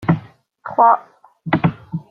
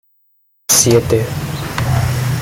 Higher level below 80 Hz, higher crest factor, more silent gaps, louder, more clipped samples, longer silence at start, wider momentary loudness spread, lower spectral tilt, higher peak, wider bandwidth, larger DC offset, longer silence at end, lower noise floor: second, -52 dBFS vs -36 dBFS; about the same, 18 dB vs 16 dB; neither; second, -18 LUFS vs -14 LUFS; neither; second, 0 s vs 0.7 s; first, 19 LU vs 12 LU; first, -10 dB/octave vs -4 dB/octave; about the same, -2 dBFS vs 0 dBFS; second, 4.8 kHz vs 17 kHz; neither; about the same, 0.1 s vs 0 s; second, -39 dBFS vs -59 dBFS